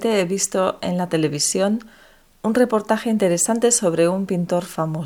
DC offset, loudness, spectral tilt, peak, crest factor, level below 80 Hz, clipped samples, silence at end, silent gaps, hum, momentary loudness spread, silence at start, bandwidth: under 0.1%; -20 LUFS; -4 dB/octave; -4 dBFS; 16 dB; -56 dBFS; under 0.1%; 0 s; none; none; 6 LU; 0 s; 18.5 kHz